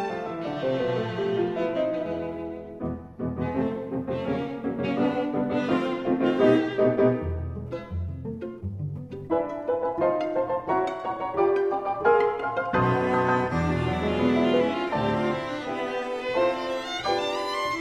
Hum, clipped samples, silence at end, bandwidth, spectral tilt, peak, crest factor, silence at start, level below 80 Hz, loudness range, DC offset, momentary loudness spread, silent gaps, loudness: none; under 0.1%; 0 s; 12 kHz; -7 dB/octave; -8 dBFS; 18 dB; 0 s; -48 dBFS; 5 LU; under 0.1%; 12 LU; none; -26 LUFS